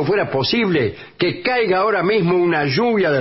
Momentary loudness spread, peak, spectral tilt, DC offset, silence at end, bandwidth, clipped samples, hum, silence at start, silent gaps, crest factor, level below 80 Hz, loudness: 4 LU; -6 dBFS; -9 dB/octave; under 0.1%; 0 s; 6 kHz; under 0.1%; none; 0 s; none; 12 dB; -52 dBFS; -17 LUFS